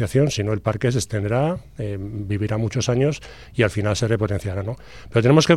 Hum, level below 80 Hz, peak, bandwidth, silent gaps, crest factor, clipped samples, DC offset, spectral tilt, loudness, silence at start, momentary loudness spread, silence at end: none; -44 dBFS; -2 dBFS; 13 kHz; none; 18 dB; under 0.1%; under 0.1%; -6 dB/octave; -22 LUFS; 0 s; 10 LU; 0 s